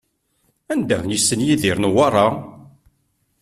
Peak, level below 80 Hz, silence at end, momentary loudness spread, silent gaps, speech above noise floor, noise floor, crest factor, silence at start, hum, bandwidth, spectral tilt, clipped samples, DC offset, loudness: -2 dBFS; -52 dBFS; 0.8 s; 10 LU; none; 49 dB; -67 dBFS; 18 dB; 0.7 s; none; 14.5 kHz; -4 dB/octave; under 0.1%; under 0.1%; -18 LUFS